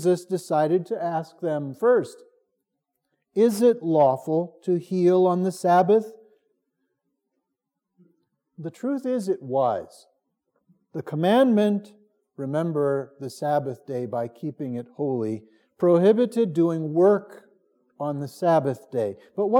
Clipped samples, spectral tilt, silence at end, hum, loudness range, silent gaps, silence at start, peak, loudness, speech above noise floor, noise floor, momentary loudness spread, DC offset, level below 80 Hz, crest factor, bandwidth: under 0.1%; -7.5 dB/octave; 0 s; none; 8 LU; none; 0 s; -6 dBFS; -23 LUFS; 60 dB; -82 dBFS; 13 LU; under 0.1%; -84 dBFS; 18 dB; 16.5 kHz